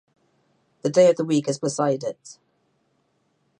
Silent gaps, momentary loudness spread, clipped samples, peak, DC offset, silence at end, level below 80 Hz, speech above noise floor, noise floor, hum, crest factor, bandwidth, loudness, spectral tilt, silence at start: none; 14 LU; under 0.1%; -6 dBFS; under 0.1%; 1.3 s; -76 dBFS; 48 dB; -69 dBFS; none; 18 dB; 10.5 kHz; -22 LUFS; -5.5 dB/octave; 0.85 s